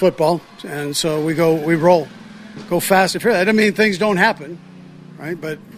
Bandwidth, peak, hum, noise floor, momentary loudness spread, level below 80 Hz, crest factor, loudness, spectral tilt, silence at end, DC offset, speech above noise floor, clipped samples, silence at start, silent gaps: 16 kHz; 0 dBFS; none; -39 dBFS; 18 LU; -56 dBFS; 18 dB; -17 LUFS; -5 dB/octave; 0 s; under 0.1%; 22 dB; under 0.1%; 0 s; none